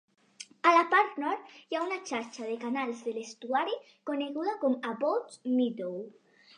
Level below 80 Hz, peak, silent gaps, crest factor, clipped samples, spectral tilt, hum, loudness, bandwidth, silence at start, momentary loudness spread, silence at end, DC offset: under -90 dBFS; -10 dBFS; none; 22 dB; under 0.1%; -4 dB/octave; none; -31 LUFS; 10 kHz; 0.4 s; 14 LU; 0.5 s; under 0.1%